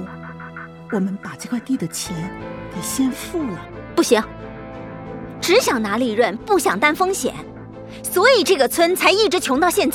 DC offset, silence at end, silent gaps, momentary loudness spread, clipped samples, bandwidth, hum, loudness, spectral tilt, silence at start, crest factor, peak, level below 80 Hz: under 0.1%; 0 s; none; 19 LU; under 0.1%; 17.5 kHz; none; -19 LUFS; -3.5 dB/octave; 0 s; 20 dB; 0 dBFS; -48 dBFS